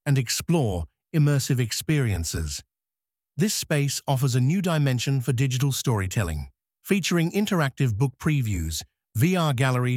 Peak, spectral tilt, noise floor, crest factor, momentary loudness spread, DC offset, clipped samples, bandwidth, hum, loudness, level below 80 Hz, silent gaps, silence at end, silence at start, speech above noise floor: -8 dBFS; -5.5 dB/octave; under -90 dBFS; 16 dB; 9 LU; under 0.1%; under 0.1%; 16.5 kHz; none; -24 LUFS; -42 dBFS; none; 0 s; 0.05 s; over 67 dB